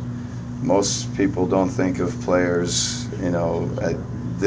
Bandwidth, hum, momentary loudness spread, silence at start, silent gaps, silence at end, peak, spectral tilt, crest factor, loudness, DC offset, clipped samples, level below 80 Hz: 8 kHz; none; 8 LU; 0 s; none; 0 s; -6 dBFS; -5 dB/octave; 16 dB; -22 LUFS; under 0.1%; under 0.1%; -42 dBFS